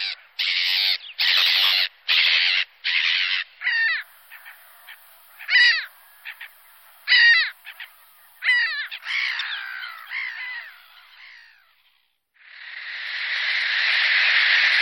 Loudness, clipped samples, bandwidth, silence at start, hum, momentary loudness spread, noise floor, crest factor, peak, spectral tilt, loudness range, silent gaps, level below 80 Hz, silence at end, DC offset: -19 LUFS; under 0.1%; 17 kHz; 0 s; none; 22 LU; -66 dBFS; 18 dB; -6 dBFS; 6 dB/octave; 13 LU; none; -82 dBFS; 0 s; under 0.1%